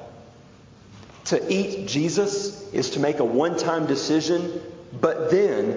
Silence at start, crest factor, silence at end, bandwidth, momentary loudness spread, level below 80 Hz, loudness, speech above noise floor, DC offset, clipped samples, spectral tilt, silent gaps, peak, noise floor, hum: 0 s; 18 dB; 0 s; 7.6 kHz; 10 LU; -60 dBFS; -23 LUFS; 26 dB; under 0.1%; under 0.1%; -5 dB/octave; none; -6 dBFS; -49 dBFS; none